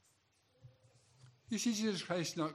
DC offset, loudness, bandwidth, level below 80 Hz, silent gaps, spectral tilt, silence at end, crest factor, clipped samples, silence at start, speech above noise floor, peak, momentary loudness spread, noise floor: under 0.1%; -37 LUFS; 14.5 kHz; -84 dBFS; none; -4 dB/octave; 0 s; 18 dB; under 0.1%; 0.65 s; 38 dB; -22 dBFS; 4 LU; -75 dBFS